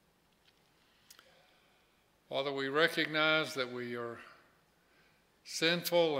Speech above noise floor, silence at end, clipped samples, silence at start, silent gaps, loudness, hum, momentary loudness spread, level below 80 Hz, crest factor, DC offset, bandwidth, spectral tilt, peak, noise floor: 38 dB; 0 s; under 0.1%; 2.3 s; none; -33 LUFS; none; 13 LU; -82 dBFS; 24 dB; under 0.1%; 16 kHz; -3.5 dB/octave; -12 dBFS; -71 dBFS